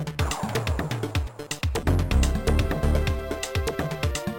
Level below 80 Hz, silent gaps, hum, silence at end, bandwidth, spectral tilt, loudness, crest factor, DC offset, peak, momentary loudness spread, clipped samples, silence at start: -28 dBFS; none; none; 0 s; 17 kHz; -5.5 dB/octave; -26 LUFS; 16 dB; under 0.1%; -10 dBFS; 6 LU; under 0.1%; 0 s